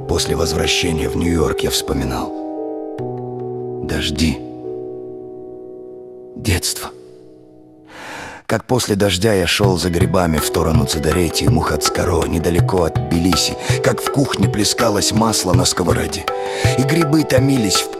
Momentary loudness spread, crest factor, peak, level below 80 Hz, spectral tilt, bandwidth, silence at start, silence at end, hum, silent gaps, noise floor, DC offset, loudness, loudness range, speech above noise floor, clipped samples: 15 LU; 18 dB; 0 dBFS; -34 dBFS; -4.5 dB/octave; 16 kHz; 0 s; 0 s; none; none; -43 dBFS; under 0.1%; -17 LUFS; 9 LU; 27 dB; under 0.1%